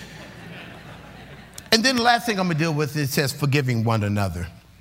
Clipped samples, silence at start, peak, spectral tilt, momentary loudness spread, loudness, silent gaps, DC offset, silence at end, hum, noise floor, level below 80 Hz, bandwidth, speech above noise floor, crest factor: under 0.1%; 0 s; -2 dBFS; -4.5 dB/octave; 23 LU; -21 LUFS; none; under 0.1%; 0.25 s; none; -42 dBFS; -50 dBFS; 16 kHz; 21 dB; 22 dB